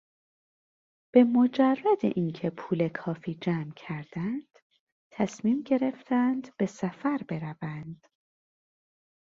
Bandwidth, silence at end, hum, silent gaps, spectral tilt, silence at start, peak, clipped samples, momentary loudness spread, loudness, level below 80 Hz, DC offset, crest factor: 7.4 kHz; 1.4 s; none; 4.62-4.70 s, 4.80-5.11 s; -7.5 dB/octave; 1.15 s; -6 dBFS; under 0.1%; 14 LU; -28 LUFS; -70 dBFS; under 0.1%; 22 dB